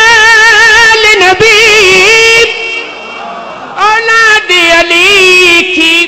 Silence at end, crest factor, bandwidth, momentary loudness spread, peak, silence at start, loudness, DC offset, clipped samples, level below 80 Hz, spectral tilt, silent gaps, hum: 0 s; 4 dB; 16.5 kHz; 19 LU; 0 dBFS; 0 s; -2 LUFS; under 0.1%; 1%; -36 dBFS; -1 dB/octave; none; none